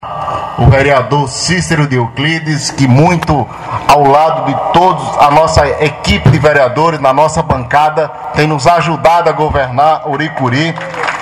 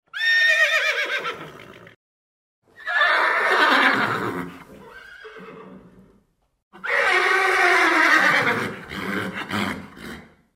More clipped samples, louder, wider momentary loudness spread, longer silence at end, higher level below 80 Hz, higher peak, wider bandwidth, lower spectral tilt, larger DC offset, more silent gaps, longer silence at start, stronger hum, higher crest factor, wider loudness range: first, 0.7% vs under 0.1%; first, -10 LUFS vs -18 LUFS; second, 7 LU vs 22 LU; second, 0 s vs 0.35 s; first, -30 dBFS vs -60 dBFS; first, 0 dBFS vs -4 dBFS; about the same, 15 kHz vs 16 kHz; first, -5.5 dB/octave vs -3 dB/octave; neither; second, none vs 1.96-2.62 s, 6.63-6.71 s; second, 0 s vs 0.15 s; neither; second, 10 dB vs 18 dB; second, 2 LU vs 6 LU